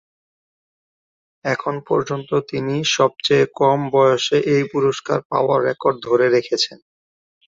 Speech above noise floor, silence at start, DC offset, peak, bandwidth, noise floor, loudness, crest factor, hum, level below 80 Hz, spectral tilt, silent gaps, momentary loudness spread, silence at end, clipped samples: over 72 dB; 1.45 s; under 0.1%; -2 dBFS; 7.8 kHz; under -90 dBFS; -18 LUFS; 18 dB; none; -60 dBFS; -4.5 dB/octave; 5.25-5.30 s; 7 LU; 0.85 s; under 0.1%